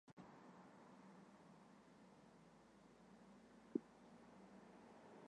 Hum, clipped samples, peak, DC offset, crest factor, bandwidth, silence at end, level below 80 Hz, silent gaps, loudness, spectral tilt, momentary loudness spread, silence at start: none; under 0.1%; -28 dBFS; under 0.1%; 32 dB; 10 kHz; 0 s; -88 dBFS; 0.13-0.17 s; -60 LUFS; -6.5 dB/octave; 17 LU; 0.05 s